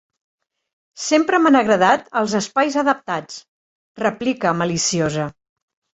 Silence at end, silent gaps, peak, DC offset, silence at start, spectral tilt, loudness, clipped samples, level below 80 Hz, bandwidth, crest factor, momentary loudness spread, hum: 0.6 s; 3.48-3.95 s; -2 dBFS; under 0.1%; 0.95 s; -4 dB/octave; -18 LUFS; under 0.1%; -58 dBFS; 8.2 kHz; 18 dB; 12 LU; none